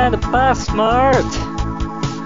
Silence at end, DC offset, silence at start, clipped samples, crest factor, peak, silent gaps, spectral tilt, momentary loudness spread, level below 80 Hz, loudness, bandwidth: 0 s; 1%; 0 s; under 0.1%; 14 dB; -2 dBFS; none; -5.5 dB/octave; 9 LU; -26 dBFS; -17 LUFS; 7.6 kHz